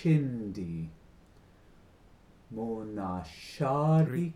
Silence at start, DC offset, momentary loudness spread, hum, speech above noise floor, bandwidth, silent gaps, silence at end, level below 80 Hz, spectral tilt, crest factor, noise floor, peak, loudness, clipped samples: 0 s; under 0.1%; 16 LU; none; 28 dB; 11 kHz; none; 0 s; -60 dBFS; -8.5 dB/octave; 16 dB; -58 dBFS; -16 dBFS; -31 LUFS; under 0.1%